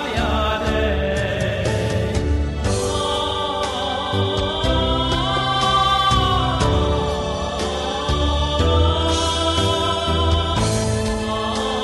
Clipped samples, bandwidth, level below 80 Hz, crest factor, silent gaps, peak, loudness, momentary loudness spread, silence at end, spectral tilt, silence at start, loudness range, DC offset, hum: under 0.1%; 12 kHz; -26 dBFS; 16 dB; none; -4 dBFS; -20 LUFS; 5 LU; 0 s; -5 dB/octave; 0 s; 3 LU; under 0.1%; none